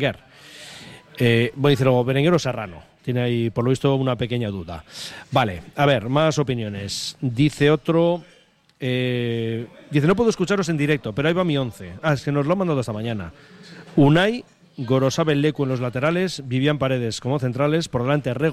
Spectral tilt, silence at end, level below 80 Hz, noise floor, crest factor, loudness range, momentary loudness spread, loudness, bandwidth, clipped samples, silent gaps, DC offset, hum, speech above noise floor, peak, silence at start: -6.5 dB/octave; 0 s; -50 dBFS; -42 dBFS; 16 dB; 2 LU; 13 LU; -21 LUFS; 13.5 kHz; under 0.1%; none; under 0.1%; none; 21 dB; -6 dBFS; 0 s